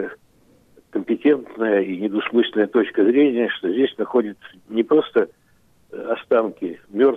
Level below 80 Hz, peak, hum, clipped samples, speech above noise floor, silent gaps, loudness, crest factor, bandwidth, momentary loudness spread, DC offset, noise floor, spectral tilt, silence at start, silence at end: -68 dBFS; -6 dBFS; none; under 0.1%; 38 dB; none; -20 LUFS; 16 dB; 4 kHz; 12 LU; under 0.1%; -57 dBFS; -7.5 dB/octave; 0 s; 0 s